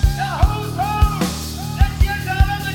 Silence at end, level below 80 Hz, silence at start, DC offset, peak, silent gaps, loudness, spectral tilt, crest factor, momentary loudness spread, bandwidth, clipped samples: 0 s; -20 dBFS; 0 s; under 0.1%; 0 dBFS; none; -20 LUFS; -5 dB/octave; 16 dB; 4 LU; 17.5 kHz; under 0.1%